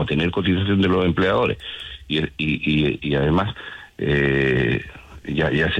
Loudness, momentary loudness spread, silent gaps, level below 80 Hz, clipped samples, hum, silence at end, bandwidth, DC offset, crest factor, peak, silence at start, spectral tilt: -21 LUFS; 12 LU; none; -40 dBFS; under 0.1%; none; 0 s; 9 kHz; under 0.1%; 12 dB; -8 dBFS; 0 s; -7.5 dB/octave